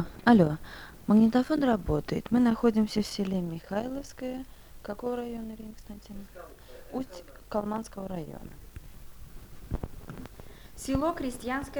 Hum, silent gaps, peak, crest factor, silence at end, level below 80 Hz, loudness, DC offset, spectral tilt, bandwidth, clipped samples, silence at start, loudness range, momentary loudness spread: none; none; -8 dBFS; 22 dB; 0 s; -46 dBFS; -29 LUFS; under 0.1%; -6.5 dB/octave; over 20 kHz; under 0.1%; 0 s; 13 LU; 25 LU